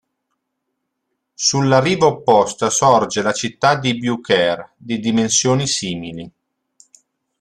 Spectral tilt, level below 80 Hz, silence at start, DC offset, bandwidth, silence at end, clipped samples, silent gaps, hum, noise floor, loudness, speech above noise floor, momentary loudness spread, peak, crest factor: -3.5 dB/octave; -56 dBFS; 1.4 s; under 0.1%; 13 kHz; 1.1 s; under 0.1%; none; none; -75 dBFS; -16 LUFS; 59 dB; 12 LU; -2 dBFS; 16 dB